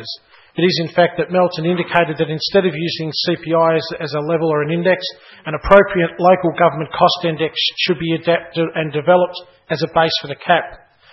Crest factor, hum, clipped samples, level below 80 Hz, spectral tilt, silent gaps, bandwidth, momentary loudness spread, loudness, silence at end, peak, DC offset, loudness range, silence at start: 16 dB; none; under 0.1%; -44 dBFS; -6.5 dB/octave; none; 6 kHz; 9 LU; -16 LUFS; 0.35 s; 0 dBFS; under 0.1%; 2 LU; 0 s